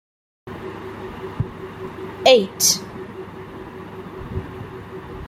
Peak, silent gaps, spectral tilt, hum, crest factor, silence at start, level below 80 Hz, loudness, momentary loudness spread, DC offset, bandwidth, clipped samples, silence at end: 0 dBFS; none; -2.5 dB/octave; none; 24 dB; 0.45 s; -46 dBFS; -20 LUFS; 21 LU; under 0.1%; 16 kHz; under 0.1%; 0 s